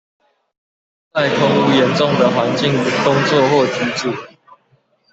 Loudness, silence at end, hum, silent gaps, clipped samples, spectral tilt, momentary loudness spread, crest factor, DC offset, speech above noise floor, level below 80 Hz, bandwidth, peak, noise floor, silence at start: -15 LUFS; 0.85 s; none; none; under 0.1%; -5.5 dB/octave; 8 LU; 14 dB; under 0.1%; 44 dB; -56 dBFS; 8.2 kHz; -2 dBFS; -59 dBFS; 1.15 s